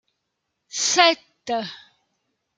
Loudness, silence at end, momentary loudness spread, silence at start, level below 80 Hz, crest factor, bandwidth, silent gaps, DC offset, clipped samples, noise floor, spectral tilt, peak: -20 LUFS; 0.8 s; 16 LU; 0.75 s; -76 dBFS; 24 dB; 10 kHz; none; under 0.1%; under 0.1%; -78 dBFS; -0.5 dB/octave; 0 dBFS